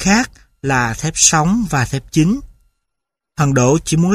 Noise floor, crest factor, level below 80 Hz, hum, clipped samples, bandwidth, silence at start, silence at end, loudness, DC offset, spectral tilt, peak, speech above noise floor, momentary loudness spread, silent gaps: -80 dBFS; 16 dB; -38 dBFS; none; under 0.1%; 15.5 kHz; 0 s; 0 s; -15 LUFS; under 0.1%; -4 dB/octave; 0 dBFS; 65 dB; 12 LU; none